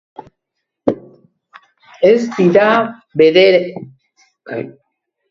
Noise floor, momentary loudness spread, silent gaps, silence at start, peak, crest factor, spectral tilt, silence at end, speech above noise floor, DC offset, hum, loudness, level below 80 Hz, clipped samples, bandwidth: -76 dBFS; 18 LU; none; 0.85 s; 0 dBFS; 16 dB; -6.5 dB/octave; 0.6 s; 64 dB; under 0.1%; none; -13 LUFS; -58 dBFS; under 0.1%; 7.4 kHz